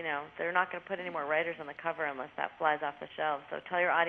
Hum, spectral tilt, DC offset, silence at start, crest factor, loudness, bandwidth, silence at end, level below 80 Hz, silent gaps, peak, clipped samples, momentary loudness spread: none; -6.5 dB/octave; under 0.1%; 0 s; 22 dB; -34 LUFS; 6.2 kHz; 0 s; -78 dBFS; none; -12 dBFS; under 0.1%; 7 LU